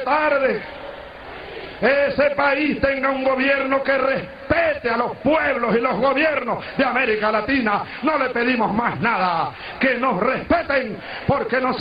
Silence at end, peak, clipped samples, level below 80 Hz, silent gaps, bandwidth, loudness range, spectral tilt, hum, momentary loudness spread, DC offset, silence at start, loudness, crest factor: 0 s; -4 dBFS; under 0.1%; -46 dBFS; none; 5.2 kHz; 1 LU; -8 dB/octave; none; 9 LU; under 0.1%; 0 s; -20 LUFS; 16 dB